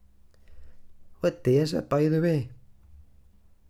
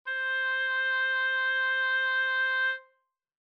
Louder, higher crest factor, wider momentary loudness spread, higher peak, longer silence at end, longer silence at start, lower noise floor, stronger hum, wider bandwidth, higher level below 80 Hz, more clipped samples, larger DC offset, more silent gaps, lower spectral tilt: about the same, -26 LUFS vs -27 LUFS; first, 16 dB vs 8 dB; first, 7 LU vs 3 LU; first, -12 dBFS vs -22 dBFS; first, 1.15 s vs 0.6 s; first, 0.5 s vs 0.05 s; second, -55 dBFS vs -73 dBFS; neither; first, 15 kHz vs 6.2 kHz; first, -54 dBFS vs under -90 dBFS; neither; neither; neither; first, -7.5 dB/octave vs 5 dB/octave